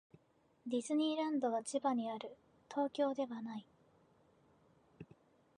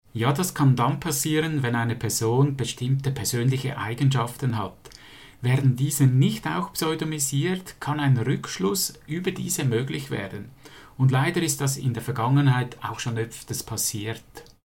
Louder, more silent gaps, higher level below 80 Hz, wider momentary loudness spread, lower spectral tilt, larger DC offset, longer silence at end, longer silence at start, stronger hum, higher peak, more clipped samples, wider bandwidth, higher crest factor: second, -39 LUFS vs -24 LUFS; neither; second, -84 dBFS vs -56 dBFS; first, 20 LU vs 10 LU; about the same, -4.5 dB/octave vs -5 dB/octave; second, under 0.1% vs 0.1%; first, 0.55 s vs 0.2 s; first, 0.65 s vs 0.15 s; neither; second, -24 dBFS vs -8 dBFS; neither; second, 10.5 kHz vs 17 kHz; about the same, 16 dB vs 16 dB